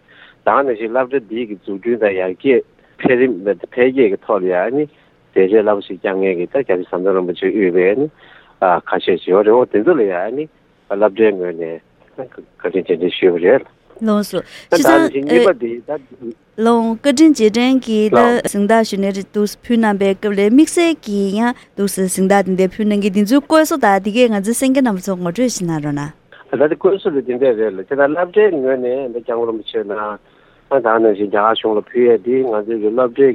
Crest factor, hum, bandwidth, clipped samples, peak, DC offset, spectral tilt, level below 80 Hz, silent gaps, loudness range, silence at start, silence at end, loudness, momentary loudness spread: 16 dB; none; 16 kHz; under 0.1%; 0 dBFS; under 0.1%; -5.5 dB/octave; -56 dBFS; none; 4 LU; 0.45 s; 0 s; -15 LUFS; 11 LU